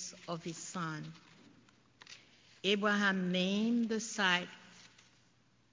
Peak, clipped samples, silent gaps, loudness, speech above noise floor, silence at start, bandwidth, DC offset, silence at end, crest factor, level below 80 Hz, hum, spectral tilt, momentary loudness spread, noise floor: -16 dBFS; under 0.1%; none; -34 LUFS; 36 dB; 0 s; 7.6 kHz; under 0.1%; 0.85 s; 22 dB; -78 dBFS; none; -4 dB/octave; 23 LU; -70 dBFS